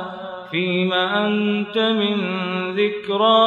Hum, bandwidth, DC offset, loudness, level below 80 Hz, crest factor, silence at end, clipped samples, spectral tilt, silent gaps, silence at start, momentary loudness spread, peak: none; 7 kHz; under 0.1%; -20 LUFS; -70 dBFS; 16 dB; 0 s; under 0.1%; -7 dB/octave; none; 0 s; 5 LU; -4 dBFS